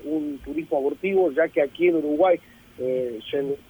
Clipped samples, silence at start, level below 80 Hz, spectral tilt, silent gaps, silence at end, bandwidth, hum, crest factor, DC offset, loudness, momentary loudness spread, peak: under 0.1%; 0 s; -56 dBFS; -7 dB/octave; none; 0.15 s; 20 kHz; none; 14 dB; under 0.1%; -24 LUFS; 8 LU; -10 dBFS